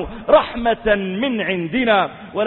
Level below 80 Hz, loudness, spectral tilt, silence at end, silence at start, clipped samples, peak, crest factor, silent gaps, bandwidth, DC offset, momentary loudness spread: -42 dBFS; -18 LUFS; -10.5 dB/octave; 0 s; 0 s; under 0.1%; -2 dBFS; 16 dB; none; 4.2 kHz; under 0.1%; 6 LU